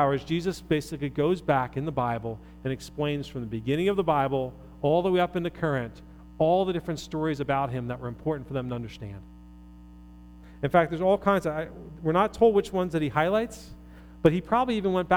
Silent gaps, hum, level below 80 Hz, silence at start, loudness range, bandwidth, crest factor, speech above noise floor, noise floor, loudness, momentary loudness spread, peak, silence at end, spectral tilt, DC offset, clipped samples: none; none; -50 dBFS; 0 s; 6 LU; 19 kHz; 20 dB; 21 dB; -47 dBFS; -27 LUFS; 12 LU; -8 dBFS; 0 s; -7 dB/octave; under 0.1%; under 0.1%